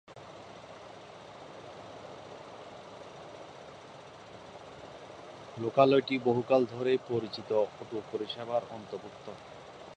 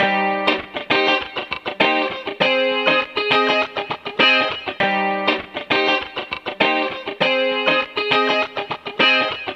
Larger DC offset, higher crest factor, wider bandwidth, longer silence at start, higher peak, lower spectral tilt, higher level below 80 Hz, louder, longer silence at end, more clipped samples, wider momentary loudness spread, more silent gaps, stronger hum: neither; first, 24 dB vs 18 dB; about the same, 9.2 kHz vs 9 kHz; about the same, 0.1 s vs 0 s; second, -10 dBFS vs -2 dBFS; first, -6.5 dB/octave vs -4 dB/octave; second, -72 dBFS vs -60 dBFS; second, -30 LUFS vs -18 LUFS; about the same, 0 s vs 0 s; neither; first, 22 LU vs 11 LU; neither; neither